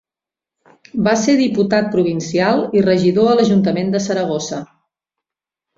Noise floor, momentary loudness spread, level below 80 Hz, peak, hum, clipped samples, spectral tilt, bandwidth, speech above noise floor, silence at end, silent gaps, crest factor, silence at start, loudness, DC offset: -88 dBFS; 8 LU; -54 dBFS; -2 dBFS; none; under 0.1%; -6 dB/octave; 7.8 kHz; 73 dB; 1.15 s; none; 16 dB; 0.95 s; -16 LUFS; under 0.1%